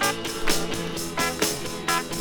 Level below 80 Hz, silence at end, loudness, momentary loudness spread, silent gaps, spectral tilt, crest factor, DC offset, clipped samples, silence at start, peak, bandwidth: -40 dBFS; 0 s; -26 LUFS; 5 LU; none; -2.5 dB/octave; 20 dB; under 0.1%; under 0.1%; 0 s; -6 dBFS; over 20 kHz